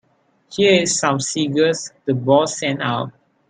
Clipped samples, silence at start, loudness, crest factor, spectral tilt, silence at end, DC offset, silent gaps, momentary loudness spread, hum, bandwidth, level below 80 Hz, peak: under 0.1%; 0.5 s; -18 LUFS; 18 dB; -4 dB/octave; 0.4 s; under 0.1%; none; 10 LU; none; 10 kHz; -60 dBFS; -2 dBFS